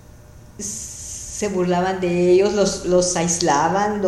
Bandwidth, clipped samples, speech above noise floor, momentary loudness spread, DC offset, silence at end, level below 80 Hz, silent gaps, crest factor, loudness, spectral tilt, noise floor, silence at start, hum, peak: 14 kHz; under 0.1%; 25 dB; 13 LU; under 0.1%; 0 s; -44 dBFS; none; 18 dB; -19 LUFS; -4.5 dB/octave; -43 dBFS; 0.2 s; none; -2 dBFS